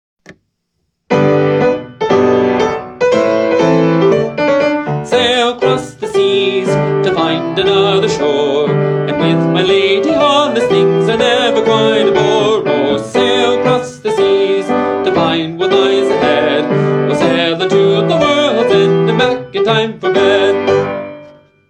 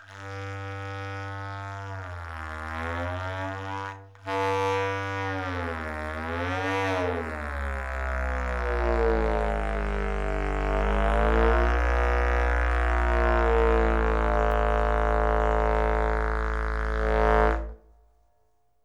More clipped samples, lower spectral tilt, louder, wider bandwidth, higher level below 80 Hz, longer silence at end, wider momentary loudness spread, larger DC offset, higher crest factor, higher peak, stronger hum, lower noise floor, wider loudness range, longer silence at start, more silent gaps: neither; second, -5.5 dB/octave vs -7 dB/octave; first, -12 LUFS vs -27 LUFS; first, 10 kHz vs 7.8 kHz; second, -50 dBFS vs -30 dBFS; second, 0.4 s vs 1.05 s; second, 4 LU vs 13 LU; neither; second, 12 dB vs 18 dB; first, 0 dBFS vs -8 dBFS; neither; about the same, -68 dBFS vs -71 dBFS; second, 2 LU vs 8 LU; first, 1.1 s vs 0 s; neither